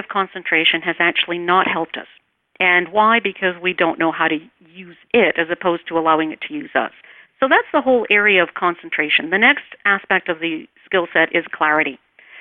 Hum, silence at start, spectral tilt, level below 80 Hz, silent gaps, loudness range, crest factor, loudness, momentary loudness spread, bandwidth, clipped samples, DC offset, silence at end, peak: none; 0 s; -7.5 dB/octave; -62 dBFS; none; 3 LU; 16 dB; -17 LUFS; 9 LU; 4.3 kHz; under 0.1%; under 0.1%; 0 s; -2 dBFS